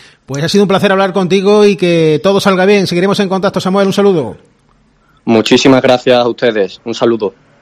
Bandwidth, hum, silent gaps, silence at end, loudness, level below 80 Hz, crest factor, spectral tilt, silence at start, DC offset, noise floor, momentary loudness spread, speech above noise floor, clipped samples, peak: 14.5 kHz; none; none; 0.3 s; -10 LUFS; -50 dBFS; 10 dB; -5.5 dB/octave; 0.3 s; under 0.1%; -51 dBFS; 9 LU; 41 dB; 0.5%; 0 dBFS